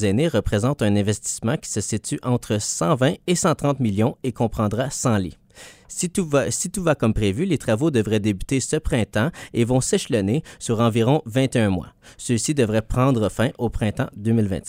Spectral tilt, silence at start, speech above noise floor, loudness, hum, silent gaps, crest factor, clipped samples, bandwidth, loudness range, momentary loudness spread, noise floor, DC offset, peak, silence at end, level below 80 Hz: -5.5 dB/octave; 0 s; 24 dB; -22 LUFS; none; none; 18 dB; under 0.1%; 16 kHz; 2 LU; 5 LU; -46 dBFS; under 0.1%; -4 dBFS; 0 s; -40 dBFS